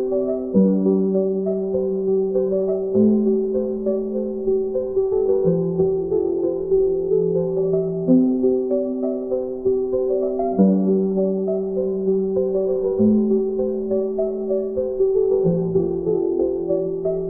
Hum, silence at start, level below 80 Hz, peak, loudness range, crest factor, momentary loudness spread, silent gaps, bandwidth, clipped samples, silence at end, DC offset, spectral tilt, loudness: none; 0 s; -48 dBFS; -4 dBFS; 1 LU; 16 dB; 6 LU; none; 1.6 kHz; under 0.1%; 0 s; 0.3%; -15.5 dB/octave; -20 LUFS